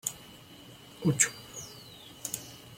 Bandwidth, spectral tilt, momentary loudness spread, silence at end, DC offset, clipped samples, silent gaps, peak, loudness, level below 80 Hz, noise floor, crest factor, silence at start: 16.5 kHz; -3 dB/octave; 24 LU; 0 s; under 0.1%; under 0.1%; none; -8 dBFS; -31 LUFS; -66 dBFS; -51 dBFS; 28 dB; 0.05 s